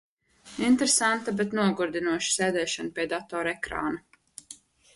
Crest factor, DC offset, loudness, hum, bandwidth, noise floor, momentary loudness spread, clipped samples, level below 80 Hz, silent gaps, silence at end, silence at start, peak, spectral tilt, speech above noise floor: 18 dB; under 0.1%; -26 LUFS; none; 11.5 kHz; -52 dBFS; 20 LU; under 0.1%; -60 dBFS; none; 0.4 s; 0.45 s; -10 dBFS; -3 dB/octave; 26 dB